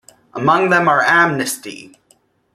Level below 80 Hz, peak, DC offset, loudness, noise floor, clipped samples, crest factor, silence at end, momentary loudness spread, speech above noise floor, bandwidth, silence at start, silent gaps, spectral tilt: -60 dBFS; -2 dBFS; under 0.1%; -14 LUFS; -57 dBFS; under 0.1%; 16 dB; 0.7 s; 20 LU; 42 dB; 15 kHz; 0.35 s; none; -4 dB/octave